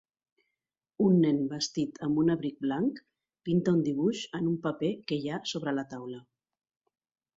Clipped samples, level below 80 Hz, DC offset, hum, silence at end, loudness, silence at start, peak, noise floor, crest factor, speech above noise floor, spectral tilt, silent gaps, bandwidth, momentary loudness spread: under 0.1%; -70 dBFS; under 0.1%; none; 1.15 s; -30 LUFS; 1 s; -14 dBFS; -88 dBFS; 18 dB; 59 dB; -6.5 dB/octave; none; 7.8 kHz; 13 LU